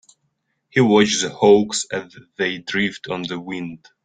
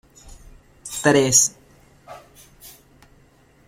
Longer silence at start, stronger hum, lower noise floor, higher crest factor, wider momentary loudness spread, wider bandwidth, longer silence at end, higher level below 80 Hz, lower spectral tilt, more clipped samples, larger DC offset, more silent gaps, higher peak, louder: first, 0.75 s vs 0.25 s; neither; first, -71 dBFS vs -55 dBFS; about the same, 18 dB vs 22 dB; second, 15 LU vs 19 LU; second, 9.6 kHz vs 16.5 kHz; second, 0.3 s vs 1 s; second, -60 dBFS vs -52 dBFS; first, -4 dB/octave vs -2.5 dB/octave; neither; neither; neither; about the same, -2 dBFS vs -2 dBFS; about the same, -19 LUFS vs -17 LUFS